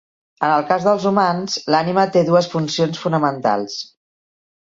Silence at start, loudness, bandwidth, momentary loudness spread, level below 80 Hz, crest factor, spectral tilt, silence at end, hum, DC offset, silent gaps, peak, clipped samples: 0.4 s; -18 LUFS; 7.8 kHz; 7 LU; -62 dBFS; 16 dB; -5.5 dB/octave; 0.85 s; none; under 0.1%; none; -2 dBFS; under 0.1%